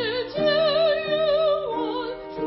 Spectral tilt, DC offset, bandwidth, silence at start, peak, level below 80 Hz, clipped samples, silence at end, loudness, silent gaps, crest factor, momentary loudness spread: -8.5 dB/octave; under 0.1%; 5.8 kHz; 0 s; -10 dBFS; -54 dBFS; under 0.1%; 0 s; -23 LUFS; none; 14 dB; 8 LU